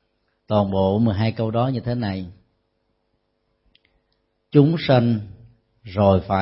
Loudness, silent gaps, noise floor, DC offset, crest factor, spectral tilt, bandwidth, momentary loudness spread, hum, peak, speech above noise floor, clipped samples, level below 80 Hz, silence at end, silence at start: -20 LUFS; none; -71 dBFS; under 0.1%; 20 dB; -12 dB/octave; 5.8 kHz; 12 LU; none; -2 dBFS; 52 dB; under 0.1%; -50 dBFS; 0 s; 0.5 s